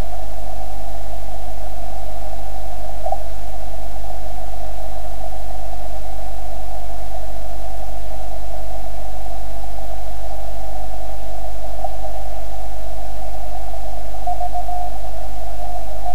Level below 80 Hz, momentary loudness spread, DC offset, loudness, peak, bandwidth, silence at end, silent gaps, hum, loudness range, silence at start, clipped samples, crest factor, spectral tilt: -30 dBFS; 5 LU; 40%; -31 LUFS; -2 dBFS; 16 kHz; 0 s; none; none; 2 LU; 0 s; under 0.1%; 20 dB; -5.5 dB/octave